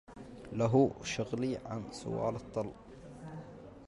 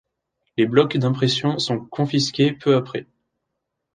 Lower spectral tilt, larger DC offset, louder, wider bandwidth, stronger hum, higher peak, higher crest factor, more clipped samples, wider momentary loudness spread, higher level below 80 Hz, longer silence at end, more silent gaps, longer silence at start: about the same, -6.5 dB/octave vs -6 dB/octave; neither; second, -35 LUFS vs -20 LUFS; first, 11.5 kHz vs 9.6 kHz; neither; second, -14 dBFS vs -2 dBFS; about the same, 20 dB vs 20 dB; neither; first, 22 LU vs 9 LU; about the same, -60 dBFS vs -62 dBFS; second, 0 s vs 0.95 s; neither; second, 0.1 s vs 0.6 s